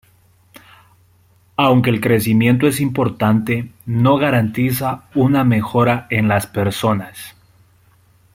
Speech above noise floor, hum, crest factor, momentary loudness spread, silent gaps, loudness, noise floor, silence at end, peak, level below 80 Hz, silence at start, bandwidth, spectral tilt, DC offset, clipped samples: 38 dB; none; 16 dB; 9 LU; none; -16 LUFS; -53 dBFS; 1.05 s; 0 dBFS; -52 dBFS; 1.6 s; 16.5 kHz; -6.5 dB/octave; under 0.1%; under 0.1%